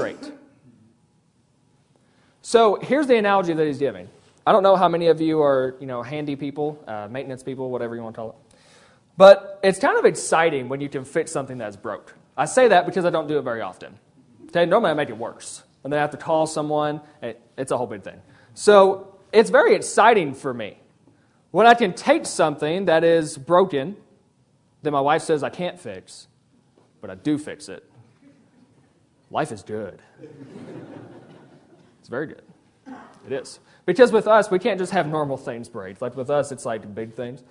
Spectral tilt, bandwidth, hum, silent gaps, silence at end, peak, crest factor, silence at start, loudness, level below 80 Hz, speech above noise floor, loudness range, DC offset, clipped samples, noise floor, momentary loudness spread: -5 dB/octave; 11 kHz; none; none; 0.15 s; 0 dBFS; 22 dB; 0 s; -20 LUFS; -66 dBFS; 42 dB; 16 LU; under 0.1%; under 0.1%; -62 dBFS; 20 LU